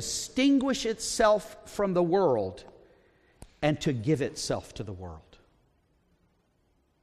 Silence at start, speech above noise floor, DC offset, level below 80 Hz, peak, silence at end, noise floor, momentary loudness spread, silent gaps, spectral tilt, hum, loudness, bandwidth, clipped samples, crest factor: 0 s; 42 dB; under 0.1%; -56 dBFS; -10 dBFS; 1.85 s; -70 dBFS; 16 LU; none; -4.5 dB/octave; none; -27 LUFS; 14.5 kHz; under 0.1%; 18 dB